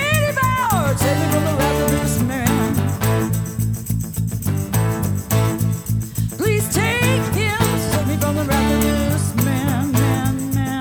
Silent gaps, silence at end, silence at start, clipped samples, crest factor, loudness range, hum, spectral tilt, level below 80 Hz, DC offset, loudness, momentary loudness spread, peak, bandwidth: none; 0 s; 0 s; under 0.1%; 16 dB; 2 LU; none; -5.5 dB/octave; -32 dBFS; under 0.1%; -19 LUFS; 5 LU; -2 dBFS; over 20 kHz